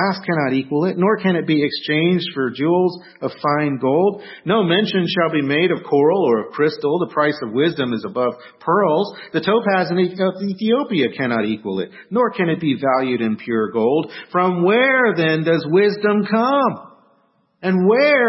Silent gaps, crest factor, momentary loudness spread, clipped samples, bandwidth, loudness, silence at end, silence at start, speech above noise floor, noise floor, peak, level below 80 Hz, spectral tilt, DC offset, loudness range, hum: none; 14 dB; 7 LU; under 0.1%; 5.8 kHz; -18 LUFS; 0 s; 0 s; 43 dB; -61 dBFS; -4 dBFS; -66 dBFS; -10 dB/octave; under 0.1%; 3 LU; none